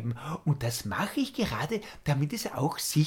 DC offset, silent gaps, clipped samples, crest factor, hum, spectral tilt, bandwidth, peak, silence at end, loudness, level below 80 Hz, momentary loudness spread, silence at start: under 0.1%; none; under 0.1%; 16 dB; none; -5 dB/octave; 18 kHz; -14 dBFS; 0 s; -31 LUFS; -54 dBFS; 4 LU; 0 s